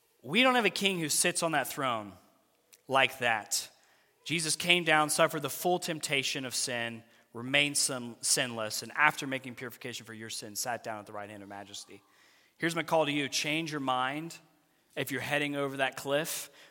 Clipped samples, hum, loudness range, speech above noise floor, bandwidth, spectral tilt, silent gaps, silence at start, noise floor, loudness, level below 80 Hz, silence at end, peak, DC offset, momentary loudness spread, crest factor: under 0.1%; none; 6 LU; 36 dB; 17 kHz; -2.5 dB/octave; none; 0.25 s; -67 dBFS; -30 LUFS; -80 dBFS; 0.05 s; -6 dBFS; under 0.1%; 18 LU; 26 dB